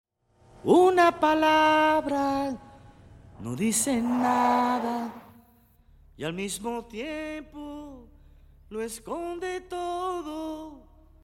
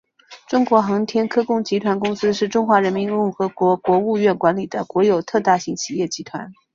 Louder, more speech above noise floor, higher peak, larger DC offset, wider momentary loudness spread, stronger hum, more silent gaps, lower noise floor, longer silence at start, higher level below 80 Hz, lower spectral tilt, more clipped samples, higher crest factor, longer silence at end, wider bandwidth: second, -26 LUFS vs -19 LUFS; first, 35 dB vs 24 dB; second, -8 dBFS vs -2 dBFS; neither; first, 20 LU vs 8 LU; neither; neither; first, -60 dBFS vs -43 dBFS; first, 0.65 s vs 0.3 s; first, -56 dBFS vs -62 dBFS; second, -4 dB/octave vs -5.5 dB/octave; neither; about the same, 20 dB vs 16 dB; first, 0.45 s vs 0.25 s; first, 16.5 kHz vs 7.6 kHz